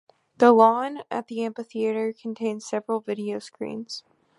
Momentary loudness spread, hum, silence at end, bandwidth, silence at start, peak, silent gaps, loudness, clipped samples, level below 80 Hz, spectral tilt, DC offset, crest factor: 17 LU; none; 0.4 s; 11.5 kHz; 0.4 s; -2 dBFS; none; -24 LUFS; under 0.1%; -78 dBFS; -5.5 dB/octave; under 0.1%; 22 dB